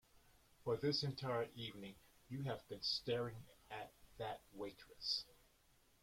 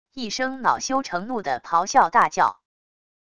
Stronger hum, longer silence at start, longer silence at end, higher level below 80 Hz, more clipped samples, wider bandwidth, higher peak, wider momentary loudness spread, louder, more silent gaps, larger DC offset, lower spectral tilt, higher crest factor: neither; first, 0.6 s vs 0.15 s; about the same, 0.7 s vs 0.75 s; second, -72 dBFS vs -60 dBFS; neither; first, 16.5 kHz vs 11 kHz; second, -26 dBFS vs -4 dBFS; first, 15 LU vs 9 LU; second, -44 LUFS vs -22 LUFS; neither; second, under 0.1% vs 0.5%; first, -5 dB/octave vs -2.5 dB/octave; about the same, 20 dB vs 20 dB